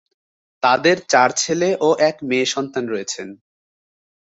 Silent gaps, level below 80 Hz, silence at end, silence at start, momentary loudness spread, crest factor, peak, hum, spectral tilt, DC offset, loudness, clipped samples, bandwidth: none; -66 dBFS; 1 s; 0.65 s; 10 LU; 18 dB; -2 dBFS; none; -3 dB/octave; under 0.1%; -18 LUFS; under 0.1%; 8.2 kHz